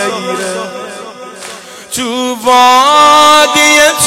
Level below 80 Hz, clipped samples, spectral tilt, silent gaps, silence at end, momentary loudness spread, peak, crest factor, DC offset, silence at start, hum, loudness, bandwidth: -48 dBFS; 0.4%; -1 dB/octave; none; 0 s; 22 LU; 0 dBFS; 10 dB; under 0.1%; 0 s; none; -7 LUFS; 17 kHz